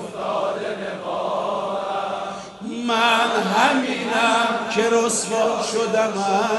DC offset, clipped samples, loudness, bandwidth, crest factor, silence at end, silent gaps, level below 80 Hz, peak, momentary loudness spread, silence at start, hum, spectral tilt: under 0.1%; under 0.1%; -21 LUFS; 11.5 kHz; 18 dB; 0 s; none; -64 dBFS; -4 dBFS; 10 LU; 0 s; none; -3 dB/octave